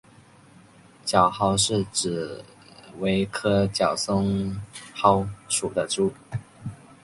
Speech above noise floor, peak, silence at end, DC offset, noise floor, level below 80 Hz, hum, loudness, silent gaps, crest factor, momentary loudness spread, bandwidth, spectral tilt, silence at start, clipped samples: 29 dB; -4 dBFS; 0.3 s; under 0.1%; -52 dBFS; -50 dBFS; none; -24 LUFS; none; 22 dB; 16 LU; 11.5 kHz; -4.5 dB/octave; 1.05 s; under 0.1%